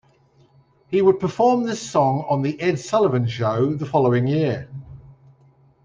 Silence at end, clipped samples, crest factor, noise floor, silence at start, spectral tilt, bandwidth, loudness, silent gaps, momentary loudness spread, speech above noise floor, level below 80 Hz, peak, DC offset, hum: 0.75 s; under 0.1%; 16 dB; -57 dBFS; 0.9 s; -7 dB/octave; 9.6 kHz; -20 LUFS; none; 6 LU; 37 dB; -58 dBFS; -4 dBFS; under 0.1%; none